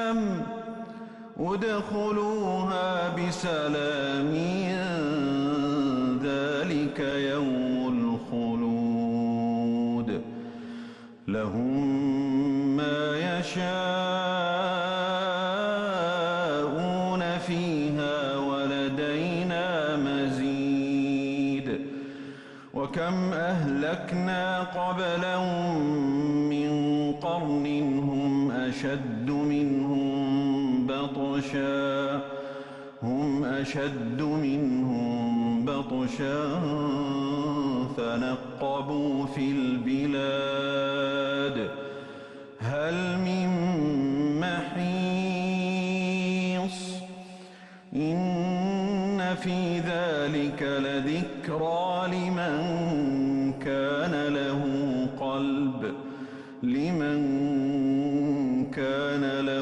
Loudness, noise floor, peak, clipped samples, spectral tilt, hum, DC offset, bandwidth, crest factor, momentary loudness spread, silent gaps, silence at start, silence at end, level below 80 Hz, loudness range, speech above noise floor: -28 LUFS; -48 dBFS; -18 dBFS; under 0.1%; -6.5 dB/octave; none; under 0.1%; 9.8 kHz; 10 dB; 7 LU; none; 0 s; 0 s; -60 dBFS; 2 LU; 21 dB